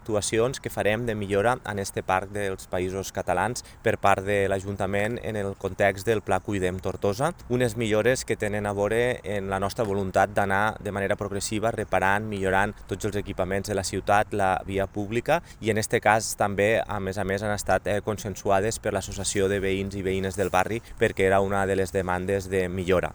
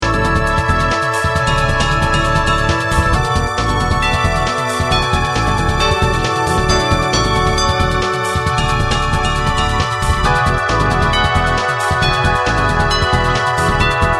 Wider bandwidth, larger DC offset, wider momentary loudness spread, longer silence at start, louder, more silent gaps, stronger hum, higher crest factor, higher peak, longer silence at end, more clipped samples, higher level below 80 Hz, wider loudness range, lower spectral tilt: first, over 20 kHz vs 13.5 kHz; second, under 0.1% vs 0.3%; first, 7 LU vs 2 LU; about the same, 0 s vs 0 s; second, -26 LUFS vs -15 LUFS; neither; neither; first, 22 dB vs 14 dB; second, -4 dBFS vs 0 dBFS; about the same, 0 s vs 0 s; neither; second, -46 dBFS vs -22 dBFS; about the same, 2 LU vs 1 LU; about the same, -5 dB/octave vs -4.5 dB/octave